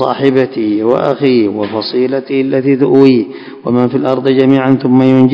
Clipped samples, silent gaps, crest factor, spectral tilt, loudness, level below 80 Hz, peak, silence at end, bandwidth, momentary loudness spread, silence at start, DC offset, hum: 1%; none; 10 dB; -9 dB/octave; -11 LUFS; -56 dBFS; 0 dBFS; 0 s; 5.4 kHz; 7 LU; 0 s; under 0.1%; none